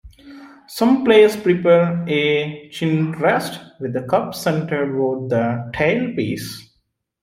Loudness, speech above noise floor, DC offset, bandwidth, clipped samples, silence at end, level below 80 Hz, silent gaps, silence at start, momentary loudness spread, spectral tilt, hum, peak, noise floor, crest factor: -18 LUFS; 50 dB; under 0.1%; 16 kHz; under 0.1%; 0.6 s; -54 dBFS; none; 0.05 s; 15 LU; -6 dB/octave; none; -2 dBFS; -68 dBFS; 18 dB